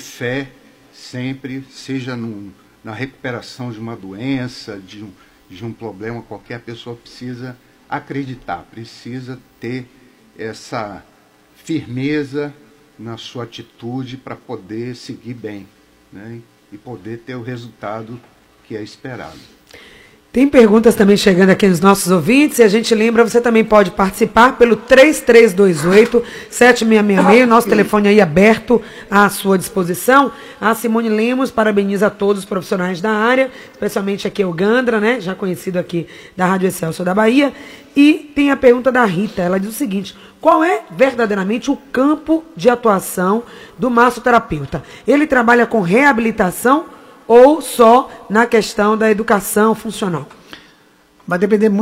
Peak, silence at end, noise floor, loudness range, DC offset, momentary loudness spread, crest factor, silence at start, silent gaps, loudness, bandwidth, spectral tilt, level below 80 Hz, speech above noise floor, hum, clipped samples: 0 dBFS; 0 s; -50 dBFS; 18 LU; under 0.1%; 20 LU; 14 dB; 0 s; none; -13 LUFS; 16 kHz; -5.5 dB/octave; -46 dBFS; 36 dB; none; under 0.1%